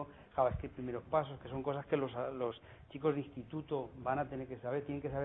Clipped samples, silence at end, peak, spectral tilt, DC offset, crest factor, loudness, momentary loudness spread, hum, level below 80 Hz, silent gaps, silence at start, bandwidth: under 0.1%; 0 s; -18 dBFS; -6.5 dB/octave; under 0.1%; 20 dB; -39 LUFS; 8 LU; none; -58 dBFS; none; 0 s; 4 kHz